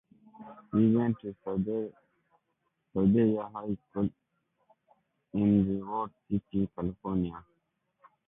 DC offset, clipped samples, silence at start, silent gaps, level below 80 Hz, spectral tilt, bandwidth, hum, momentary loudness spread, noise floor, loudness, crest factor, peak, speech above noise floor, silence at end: under 0.1%; under 0.1%; 0.4 s; none; -56 dBFS; -12.5 dB/octave; 3.7 kHz; none; 12 LU; -79 dBFS; -30 LUFS; 18 dB; -14 dBFS; 50 dB; 0.85 s